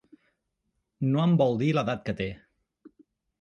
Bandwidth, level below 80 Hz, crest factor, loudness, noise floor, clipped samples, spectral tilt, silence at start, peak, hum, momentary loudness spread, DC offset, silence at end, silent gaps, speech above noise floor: 7 kHz; -58 dBFS; 18 dB; -26 LUFS; -79 dBFS; under 0.1%; -8 dB/octave; 1 s; -10 dBFS; none; 11 LU; under 0.1%; 1.05 s; none; 54 dB